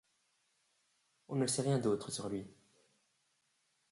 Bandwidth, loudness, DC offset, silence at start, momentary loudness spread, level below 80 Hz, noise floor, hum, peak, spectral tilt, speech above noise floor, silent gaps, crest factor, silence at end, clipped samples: 11.5 kHz; -36 LUFS; under 0.1%; 1.3 s; 11 LU; -74 dBFS; -79 dBFS; none; -22 dBFS; -5 dB/octave; 43 dB; none; 18 dB; 1.4 s; under 0.1%